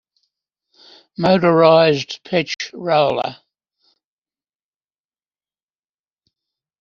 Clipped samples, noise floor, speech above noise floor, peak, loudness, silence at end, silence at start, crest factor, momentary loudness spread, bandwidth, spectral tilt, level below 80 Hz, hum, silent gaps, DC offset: under 0.1%; under -90 dBFS; over 75 dB; -2 dBFS; -16 LUFS; 3.45 s; 1.2 s; 20 dB; 13 LU; 7.2 kHz; -4 dB/octave; -62 dBFS; none; none; under 0.1%